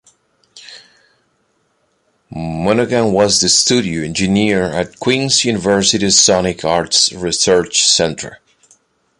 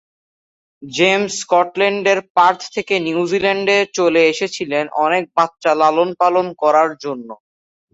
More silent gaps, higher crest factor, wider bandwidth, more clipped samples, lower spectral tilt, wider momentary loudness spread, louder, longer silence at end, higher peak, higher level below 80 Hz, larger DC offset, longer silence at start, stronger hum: second, none vs 2.30-2.35 s; about the same, 16 dB vs 16 dB; first, 11.5 kHz vs 8 kHz; neither; about the same, -2.5 dB/octave vs -3.5 dB/octave; first, 10 LU vs 7 LU; first, -13 LUFS vs -16 LUFS; first, 0.85 s vs 0.6 s; about the same, 0 dBFS vs -2 dBFS; first, -44 dBFS vs -62 dBFS; neither; second, 0.55 s vs 0.8 s; neither